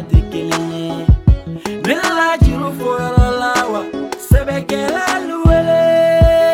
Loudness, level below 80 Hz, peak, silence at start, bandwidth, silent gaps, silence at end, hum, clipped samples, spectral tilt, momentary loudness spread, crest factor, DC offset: -15 LUFS; -20 dBFS; 0 dBFS; 0 s; 16.5 kHz; none; 0 s; none; under 0.1%; -6 dB/octave; 9 LU; 14 dB; under 0.1%